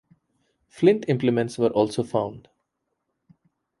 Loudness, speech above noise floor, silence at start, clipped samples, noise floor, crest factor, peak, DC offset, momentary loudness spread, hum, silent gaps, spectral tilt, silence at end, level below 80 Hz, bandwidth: -23 LUFS; 56 dB; 0.75 s; under 0.1%; -78 dBFS; 20 dB; -4 dBFS; under 0.1%; 7 LU; none; none; -7 dB/octave; 1.4 s; -64 dBFS; 11.5 kHz